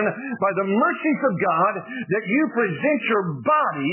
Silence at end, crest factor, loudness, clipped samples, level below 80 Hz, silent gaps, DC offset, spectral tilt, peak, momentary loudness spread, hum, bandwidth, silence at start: 0 s; 14 dB; -21 LUFS; under 0.1%; -70 dBFS; none; under 0.1%; -10 dB/octave; -8 dBFS; 5 LU; none; 3.2 kHz; 0 s